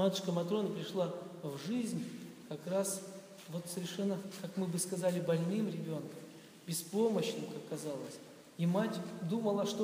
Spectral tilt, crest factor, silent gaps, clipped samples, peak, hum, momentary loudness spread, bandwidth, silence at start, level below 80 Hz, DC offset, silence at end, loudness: -5.5 dB/octave; 18 dB; none; under 0.1%; -20 dBFS; none; 14 LU; 15.5 kHz; 0 s; -84 dBFS; under 0.1%; 0 s; -37 LUFS